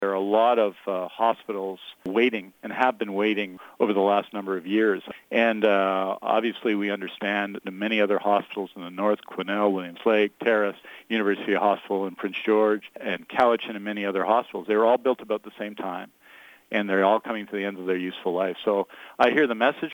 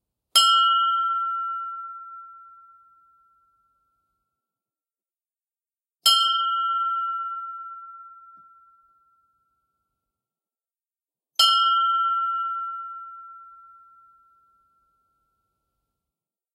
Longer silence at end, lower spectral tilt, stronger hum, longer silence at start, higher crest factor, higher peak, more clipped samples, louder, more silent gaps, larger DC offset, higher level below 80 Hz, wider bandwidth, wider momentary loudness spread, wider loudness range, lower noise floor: second, 0 s vs 3.05 s; first, -6.5 dB/octave vs 4.5 dB/octave; neither; second, 0 s vs 0.35 s; second, 18 dB vs 24 dB; about the same, -6 dBFS vs -4 dBFS; neither; second, -25 LUFS vs -21 LUFS; neither; neither; first, -74 dBFS vs -88 dBFS; first, over 20 kHz vs 16 kHz; second, 10 LU vs 24 LU; second, 2 LU vs 16 LU; second, -51 dBFS vs under -90 dBFS